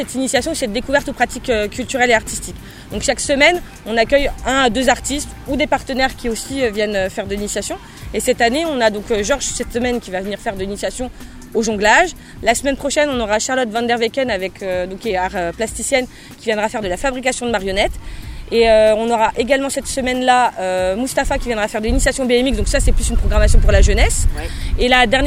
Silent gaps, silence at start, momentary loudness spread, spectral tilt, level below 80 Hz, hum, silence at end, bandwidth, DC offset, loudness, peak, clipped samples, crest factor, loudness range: none; 0 s; 10 LU; -3.5 dB/octave; -24 dBFS; none; 0 s; 16 kHz; under 0.1%; -17 LUFS; 0 dBFS; under 0.1%; 16 dB; 4 LU